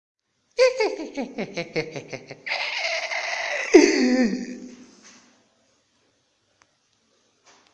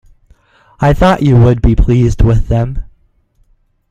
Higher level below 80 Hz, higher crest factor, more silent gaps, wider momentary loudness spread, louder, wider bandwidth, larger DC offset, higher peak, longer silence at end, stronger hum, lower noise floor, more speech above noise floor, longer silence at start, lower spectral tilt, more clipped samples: second, -64 dBFS vs -18 dBFS; first, 26 dB vs 12 dB; neither; first, 20 LU vs 7 LU; second, -22 LUFS vs -11 LUFS; first, 9.2 kHz vs 7.8 kHz; neither; about the same, 0 dBFS vs 0 dBFS; first, 2.9 s vs 1.1 s; neither; first, -68 dBFS vs -53 dBFS; second, 39 dB vs 44 dB; second, 0.6 s vs 0.8 s; second, -3.5 dB/octave vs -8.5 dB/octave; neither